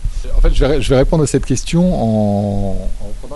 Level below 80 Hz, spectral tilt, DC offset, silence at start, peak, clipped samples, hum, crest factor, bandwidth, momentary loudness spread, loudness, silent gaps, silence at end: -18 dBFS; -6.5 dB/octave; under 0.1%; 0 s; -2 dBFS; under 0.1%; none; 10 dB; 11.5 kHz; 10 LU; -16 LUFS; none; 0 s